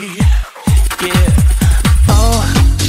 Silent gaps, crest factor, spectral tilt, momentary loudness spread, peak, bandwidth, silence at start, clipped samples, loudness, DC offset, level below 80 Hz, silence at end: none; 10 dB; -5 dB/octave; 4 LU; 0 dBFS; 16.5 kHz; 0 s; under 0.1%; -12 LUFS; under 0.1%; -12 dBFS; 0 s